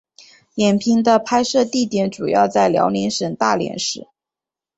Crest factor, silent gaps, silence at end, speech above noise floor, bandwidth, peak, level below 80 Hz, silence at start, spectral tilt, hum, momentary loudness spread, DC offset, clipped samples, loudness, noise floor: 16 dB; none; 0.75 s; 71 dB; 8.2 kHz; -2 dBFS; -58 dBFS; 0.55 s; -4.5 dB/octave; none; 7 LU; under 0.1%; under 0.1%; -18 LUFS; -88 dBFS